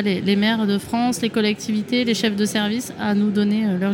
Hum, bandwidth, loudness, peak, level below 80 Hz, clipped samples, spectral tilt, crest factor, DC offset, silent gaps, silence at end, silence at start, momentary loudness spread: none; 17 kHz; -20 LUFS; -6 dBFS; -60 dBFS; under 0.1%; -5 dB/octave; 14 dB; under 0.1%; none; 0 s; 0 s; 4 LU